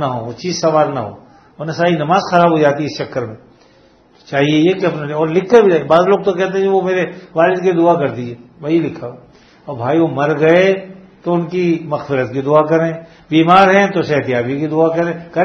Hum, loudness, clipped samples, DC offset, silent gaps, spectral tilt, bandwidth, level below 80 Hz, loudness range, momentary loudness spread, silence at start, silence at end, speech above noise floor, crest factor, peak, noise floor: none; -14 LUFS; under 0.1%; under 0.1%; none; -6.5 dB/octave; 6.6 kHz; -56 dBFS; 3 LU; 13 LU; 0 s; 0 s; 35 dB; 14 dB; 0 dBFS; -48 dBFS